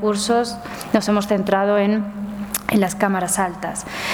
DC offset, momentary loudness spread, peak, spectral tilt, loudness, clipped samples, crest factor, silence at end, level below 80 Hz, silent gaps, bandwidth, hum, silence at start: under 0.1%; 9 LU; -2 dBFS; -4.5 dB/octave; -20 LUFS; under 0.1%; 18 dB; 0 s; -50 dBFS; none; 19.5 kHz; none; 0 s